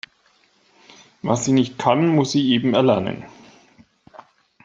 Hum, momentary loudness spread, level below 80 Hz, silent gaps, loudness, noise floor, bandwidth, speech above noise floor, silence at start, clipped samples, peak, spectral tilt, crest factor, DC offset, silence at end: none; 13 LU; -60 dBFS; none; -19 LUFS; -60 dBFS; 8 kHz; 42 dB; 1.25 s; under 0.1%; -2 dBFS; -5.5 dB/octave; 18 dB; under 0.1%; 1.35 s